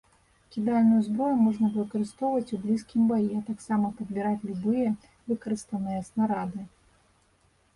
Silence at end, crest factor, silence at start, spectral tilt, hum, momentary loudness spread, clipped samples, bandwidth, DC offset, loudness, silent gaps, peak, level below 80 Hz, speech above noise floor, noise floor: 1.1 s; 14 dB; 0.5 s; -8 dB/octave; none; 10 LU; under 0.1%; 11.5 kHz; under 0.1%; -28 LUFS; none; -14 dBFS; -62 dBFS; 39 dB; -66 dBFS